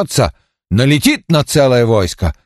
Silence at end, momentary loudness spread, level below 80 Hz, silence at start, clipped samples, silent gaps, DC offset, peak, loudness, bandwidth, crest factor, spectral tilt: 0.15 s; 7 LU; -30 dBFS; 0 s; under 0.1%; none; under 0.1%; 0 dBFS; -13 LUFS; 13 kHz; 12 dB; -5.5 dB/octave